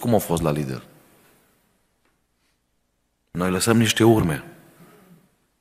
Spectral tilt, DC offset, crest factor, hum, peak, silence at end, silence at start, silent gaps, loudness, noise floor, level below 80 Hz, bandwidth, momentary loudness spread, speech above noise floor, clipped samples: -5 dB/octave; under 0.1%; 22 dB; 60 Hz at -50 dBFS; -2 dBFS; 1.1 s; 0 s; none; -20 LUFS; -71 dBFS; -48 dBFS; 15.5 kHz; 15 LU; 51 dB; under 0.1%